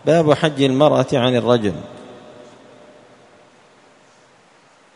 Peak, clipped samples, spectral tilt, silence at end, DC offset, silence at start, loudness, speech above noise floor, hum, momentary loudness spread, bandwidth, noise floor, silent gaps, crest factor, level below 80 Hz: 0 dBFS; under 0.1%; -6.5 dB/octave; 2.8 s; under 0.1%; 0.05 s; -16 LUFS; 36 dB; none; 23 LU; 10.5 kHz; -52 dBFS; none; 20 dB; -56 dBFS